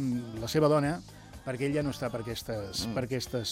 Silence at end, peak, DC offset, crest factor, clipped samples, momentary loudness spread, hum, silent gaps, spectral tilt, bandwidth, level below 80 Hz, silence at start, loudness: 0 s; -12 dBFS; under 0.1%; 18 dB; under 0.1%; 13 LU; none; none; -5.5 dB/octave; 16 kHz; -54 dBFS; 0 s; -31 LUFS